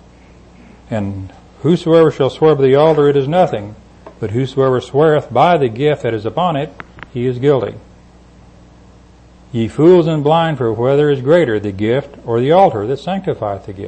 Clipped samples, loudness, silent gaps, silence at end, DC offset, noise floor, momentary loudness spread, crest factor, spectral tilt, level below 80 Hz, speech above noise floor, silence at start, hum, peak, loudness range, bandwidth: under 0.1%; -14 LUFS; none; 0 s; under 0.1%; -43 dBFS; 14 LU; 14 dB; -8 dB/octave; -46 dBFS; 30 dB; 0.9 s; none; 0 dBFS; 6 LU; 8.6 kHz